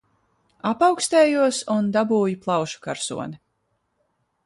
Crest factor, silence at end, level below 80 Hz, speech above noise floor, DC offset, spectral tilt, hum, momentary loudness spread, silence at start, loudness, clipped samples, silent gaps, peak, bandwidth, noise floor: 18 dB; 1.1 s; -66 dBFS; 51 dB; under 0.1%; -4.5 dB/octave; none; 12 LU; 0.65 s; -21 LUFS; under 0.1%; none; -6 dBFS; 11.5 kHz; -72 dBFS